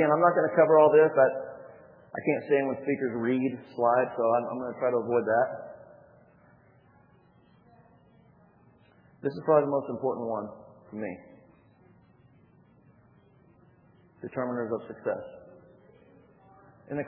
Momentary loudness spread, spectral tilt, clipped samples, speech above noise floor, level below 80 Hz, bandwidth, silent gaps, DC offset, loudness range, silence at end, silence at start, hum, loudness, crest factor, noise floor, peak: 20 LU; -10.5 dB/octave; under 0.1%; 35 dB; -74 dBFS; 4.9 kHz; none; under 0.1%; 17 LU; 0 s; 0 s; none; -27 LUFS; 22 dB; -60 dBFS; -8 dBFS